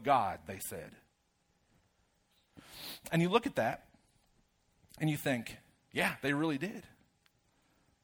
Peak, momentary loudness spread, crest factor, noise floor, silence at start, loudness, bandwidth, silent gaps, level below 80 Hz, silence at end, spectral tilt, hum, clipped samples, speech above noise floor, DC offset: -12 dBFS; 17 LU; 24 dB; -76 dBFS; 0 s; -35 LUFS; over 20 kHz; none; -70 dBFS; 1.2 s; -5.5 dB/octave; none; under 0.1%; 42 dB; under 0.1%